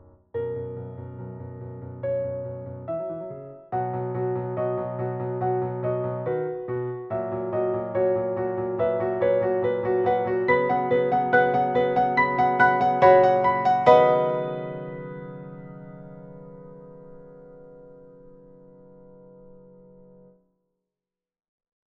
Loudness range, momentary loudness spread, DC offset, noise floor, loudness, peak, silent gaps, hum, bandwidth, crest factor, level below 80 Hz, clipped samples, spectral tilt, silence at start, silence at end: 14 LU; 20 LU; under 0.1%; under -90 dBFS; -23 LUFS; -2 dBFS; none; none; 6.8 kHz; 24 dB; -60 dBFS; under 0.1%; -8.5 dB/octave; 0.35 s; 2.3 s